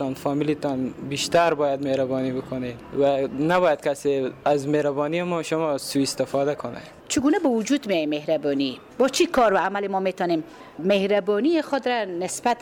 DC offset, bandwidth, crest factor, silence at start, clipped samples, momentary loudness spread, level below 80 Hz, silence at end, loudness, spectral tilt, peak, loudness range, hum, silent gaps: under 0.1%; 18.5 kHz; 14 dB; 0 s; under 0.1%; 8 LU; -56 dBFS; 0 s; -23 LUFS; -4.5 dB/octave; -10 dBFS; 2 LU; none; none